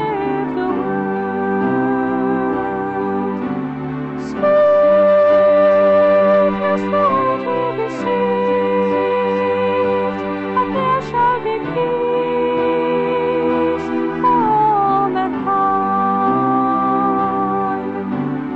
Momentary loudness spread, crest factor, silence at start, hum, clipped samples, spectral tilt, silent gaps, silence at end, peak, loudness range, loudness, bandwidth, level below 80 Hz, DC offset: 9 LU; 10 dB; 0 s; none; under 0.1%; -8 dB/octave; none; 0 s; -6 dBFS; 6 LU; -16 LUFS; 7.6 kHz; -50 dBFS; under 0.1%